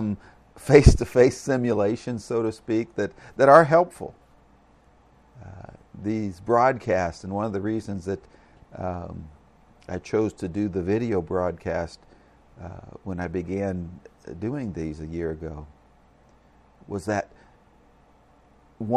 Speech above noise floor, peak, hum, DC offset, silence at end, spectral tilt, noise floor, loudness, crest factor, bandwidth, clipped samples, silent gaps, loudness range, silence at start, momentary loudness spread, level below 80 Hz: 33 dB; 0 dBFS; none; under 0.1%; 0 s; -7 dB/octave; -57 dBFS; -24 LUFS; 24 dB; 13.5 kHz; under 0.1%; none; 13 LU; 0 s; 22 LU; -38 dBFS